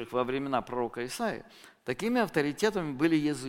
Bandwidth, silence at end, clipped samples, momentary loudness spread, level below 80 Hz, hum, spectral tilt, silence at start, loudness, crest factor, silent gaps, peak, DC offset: 16.5 kHz; 0 s; under 0.1%; 8 LU; -60 dBFS; none; -5.5 dB/octave; 0 s; -30 LUFS; 18 dB; none; -12 dBFS; under 0.1%